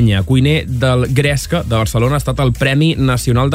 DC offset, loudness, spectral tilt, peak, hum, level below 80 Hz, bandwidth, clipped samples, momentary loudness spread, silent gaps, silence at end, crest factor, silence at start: under 0.1%; -14 LUFS; -6 dB/octave; -2 dBFS; none; -28 dBFS; 16 kHz; under 0.1%; 3 LU; none; 0 s; 12 dB; 0 s